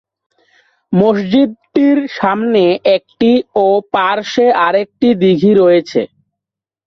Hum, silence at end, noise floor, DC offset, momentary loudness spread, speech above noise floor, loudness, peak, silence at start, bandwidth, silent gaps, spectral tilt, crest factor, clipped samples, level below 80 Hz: none; 0.8 s; -84 dBFS; under 0.1%; 5 LU; 73 dB; -12 LUFS; -2 dBFS; 0.9 s; 6.6 kHz; none; -7 dB/octave; 12 dB; under 0.1%; -54 dBFS